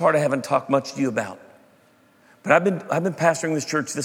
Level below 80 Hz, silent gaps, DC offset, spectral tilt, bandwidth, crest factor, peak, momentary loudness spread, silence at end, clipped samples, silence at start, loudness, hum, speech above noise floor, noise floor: -74 dBFS; none; under 0.1%; -5 dB/octave; 16.5 kHz; 20 dB; -2 dBFS; 7 LU; 0 s; under 0.1%; 0 s; -22 LUFS; none; 35 dB; -57 dBFS